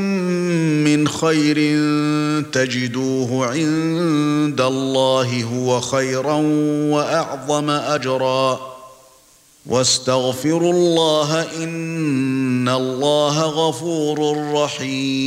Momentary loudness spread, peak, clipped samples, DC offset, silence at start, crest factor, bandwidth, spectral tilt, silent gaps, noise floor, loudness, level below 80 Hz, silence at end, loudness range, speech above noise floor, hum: 5 LU; -4 dBFS; under 0.1%; under 0.1%; 0 s; 16 dB; 15.5 kHz; -5 dB/octave; none; -51 dBFS; -18 LUFS; -62 dBFS; 0 s; 2 LU; 33 dB; none